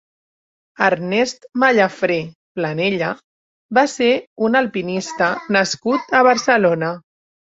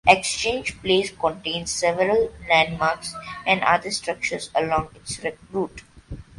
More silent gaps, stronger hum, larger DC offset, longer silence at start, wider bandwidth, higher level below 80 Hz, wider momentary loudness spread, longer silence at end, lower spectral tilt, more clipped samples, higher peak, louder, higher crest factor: first, 2.35-2.55 s, 3.24-3.69 s, 4.27-4.36 s vs none; neither; neither; first, 0.8 s vs 0.05 s; second, 8 kHz vs 11.5 kHz; second, -62 dBFS vs -48 dBFS; about the same, 10 LU vs 11 LU; first, 0.55 s vs 0.15 s; first, -4.5 dB/octave vs -3 dB/octave; neither; about the same, -2 dBFS vs 0 dBFS; first, -18 LUFS vs -23 LUFS; second, 18 dB vs 24 dB